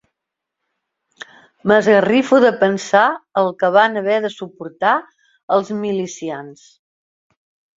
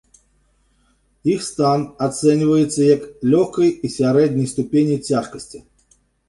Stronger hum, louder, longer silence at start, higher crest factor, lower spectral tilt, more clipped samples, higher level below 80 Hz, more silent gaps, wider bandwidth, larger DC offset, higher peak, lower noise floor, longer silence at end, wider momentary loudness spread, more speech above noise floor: neither; about the same, -16 LUFS vs -18 LUFS; first, 1.65 s vs 1.25 s; about the same, 18 dB vs 16 dB; second, -5 dB/octave vs -6.5 dB/octave; neither; second, -64 dBFS vs -54 dBFS; first, 5.43-5.48 s vs none; second, 7.8 kHz vs 11.5 kHz; neither; about the same, -2 dBFS vs -2 dBFS; first, -81 dBFS vs -61 dBFS; first, 1.25 s vs 0.7 s; first, 14 LU vs 7 LU; first, 65 dB vs 43 dB